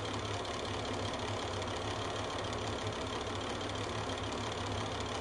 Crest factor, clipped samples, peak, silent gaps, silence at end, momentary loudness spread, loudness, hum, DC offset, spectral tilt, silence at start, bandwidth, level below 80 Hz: 14 dB; under 0.1%; -24 dBFS; none; 0 s; 1 LU; -38 LUFS; none; under 0.1%; -4 dB/octave; 0 s; 11.5 kHz; -52 dBFS